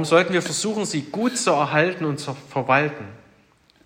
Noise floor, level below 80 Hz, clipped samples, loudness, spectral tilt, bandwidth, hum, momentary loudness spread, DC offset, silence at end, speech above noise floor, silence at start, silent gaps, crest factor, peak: -57 dBFS; -66 dBFS; under 0.1%; -22 LUFS; -4 dB/octave; 16 kHz; none; 10 LU; under 0.1%; 0.7 s; 36 dB; 0 s; none; 20 dB; -4 dBFS